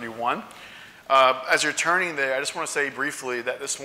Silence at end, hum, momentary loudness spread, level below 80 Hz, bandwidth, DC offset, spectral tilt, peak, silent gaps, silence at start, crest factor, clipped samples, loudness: 0 s; none; 19 LU; -70 dBFS; 16 kHz; under 0.1%; -1.5 dB/octave; -6 dBFS; none; 0 s; 20 dB; under 0.1%; -23 LUFS